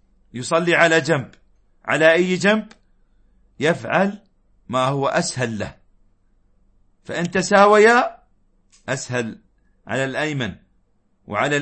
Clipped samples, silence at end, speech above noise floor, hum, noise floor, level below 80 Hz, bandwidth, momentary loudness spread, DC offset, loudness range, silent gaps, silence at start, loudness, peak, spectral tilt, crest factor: under 0.1%; 0 s; 43 dB; none; -61 dBFS; -56 dBFS; 8.8 kHz; 16 LU; under 0.1%; 7 LU; none; 0.35 s; -19 LUFS; -2 dBFS; -4.5 dB/octave; 20 dB